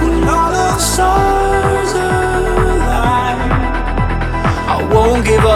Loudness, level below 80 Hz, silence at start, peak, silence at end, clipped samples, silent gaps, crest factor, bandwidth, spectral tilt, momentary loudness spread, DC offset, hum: -14 LUFS; -20 dBFS; 0 s; 0 dBFS; 0 s; under 0.1%; none; 12 dB; 15.5 kHz; -5 dB/octave; 5 LU; under 0.1%; none